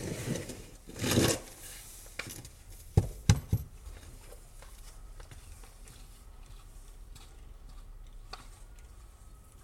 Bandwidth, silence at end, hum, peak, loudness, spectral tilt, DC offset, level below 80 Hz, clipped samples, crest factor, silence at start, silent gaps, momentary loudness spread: 16.5 kHz; 0 s; none; -6 dBFS; -33 LUFS; -4.5 dB/octave; under 0.1%; -46 dBFS; under 0.1%; 30 dB; 0 s; none; 25 LU